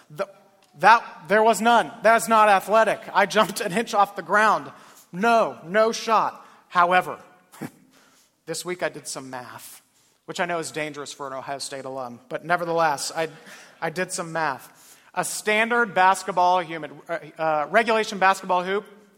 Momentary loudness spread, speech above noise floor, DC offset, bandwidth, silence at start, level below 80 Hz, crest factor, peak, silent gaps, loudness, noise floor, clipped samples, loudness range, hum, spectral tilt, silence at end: 17 LU; 36 dB; under 0.1%; 17 kHz; 0.1 s; -72 dBFS; 22 dB; 0 dBFS; none; -22 LUFS; -59 dBFS; under 0.1%; 12 LU; none; -3 dB/octave; 0.3 s